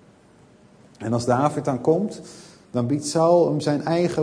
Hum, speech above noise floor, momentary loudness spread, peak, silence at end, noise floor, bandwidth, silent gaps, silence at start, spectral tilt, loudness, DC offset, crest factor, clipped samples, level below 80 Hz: none; 32 dB; 12 LU; -6 dBFS; 0 s; -53 dBFS; 10.5 kHz; none; 1 s; -6.5 dB/octave; -22 LUFS; under 0.1%; 16 dB; under 0.1%; -60 dBFS